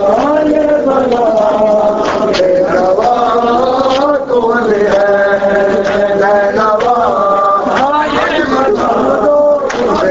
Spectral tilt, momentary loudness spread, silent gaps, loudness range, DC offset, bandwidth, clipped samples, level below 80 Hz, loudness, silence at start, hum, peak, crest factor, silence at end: -5.5 dB/octave; 2 LU; none; 0 LU; under 0.1%; 7.8 kHz; under 0.1%; -40 dBFS; -10 LUFS; 0 s; none; 0 dBFS; 10 dB; 0 s